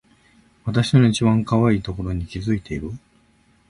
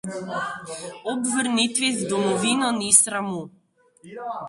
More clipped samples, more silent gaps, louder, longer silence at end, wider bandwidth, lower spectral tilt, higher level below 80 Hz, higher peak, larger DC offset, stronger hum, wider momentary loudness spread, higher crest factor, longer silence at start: neither; neither; about the same, -20 LUFS vs -21 LUFS; first, 0.7 s vs 0 s; about the same, 11.5 kHz vs 12 kHz; first, -7 dB/octave vs -2 dB/octave; first, -40 dBFS vs -66 dBFS; second, -4 dBFS vs 0 dBFS; neither; neither; second, 15 LU vs 18 LU; second, 18 dB vs 24 dB; first, 0.65 s vs 0.05 s